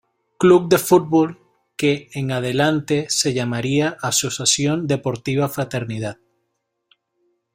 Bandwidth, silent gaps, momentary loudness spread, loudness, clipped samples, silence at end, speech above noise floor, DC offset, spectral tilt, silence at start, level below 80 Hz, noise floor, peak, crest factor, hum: 16 kHz; none; 10 LU; -19 LUFS; under 0.1%; 1.4 s; 55 dB; under 0.1%; -4.5 dB/octave; 0.4 s; -56 dBFS; -74 dBFS; -2 dBFS; 18 dB; none